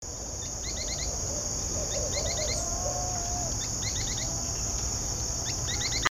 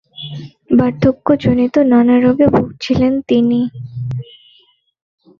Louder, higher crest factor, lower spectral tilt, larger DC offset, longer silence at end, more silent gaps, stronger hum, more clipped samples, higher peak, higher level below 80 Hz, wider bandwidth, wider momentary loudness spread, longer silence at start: second, -29 LUFS vs -14 LUFS; first, 22 dB vs 14 dB; second, -2 dB/octave vs -8.5 dB/octave; neither; second, 0.1 s vs 1.2 s; neither; neither; neither; second, -10 dBFS vs 0 dBFS; about the same, -40 dBFS vs -42 dBFS; first, over 20 kHz vs 6.8 kHz; second, 3 LU vs 16 LU; second, 0 s vs 0.2 s